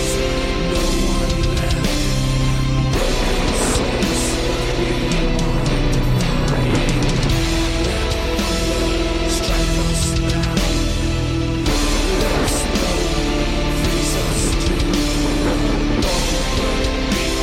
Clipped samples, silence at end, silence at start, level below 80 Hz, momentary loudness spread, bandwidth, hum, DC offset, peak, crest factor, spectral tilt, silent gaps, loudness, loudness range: under 0.1%; 0 s; 0 s; -22 dBFS; 2 LU; 16 kHz; none; under 0.1%; -6 dBFS; 12 dB; -4.5 dB/octave; none; -19 LUFS; 0 LU